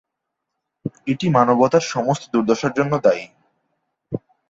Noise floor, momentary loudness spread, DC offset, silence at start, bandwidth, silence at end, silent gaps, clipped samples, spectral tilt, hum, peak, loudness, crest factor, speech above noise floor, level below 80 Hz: -80 dBFS; 16 LU; under 0.1%; 0.85 s; 8 kHz; 0.3 s; none; under 0.1%; -6 dB/octave; none; -2 dBFS; -19 LUFS; 18 dB; 62 dB; -60 dBFS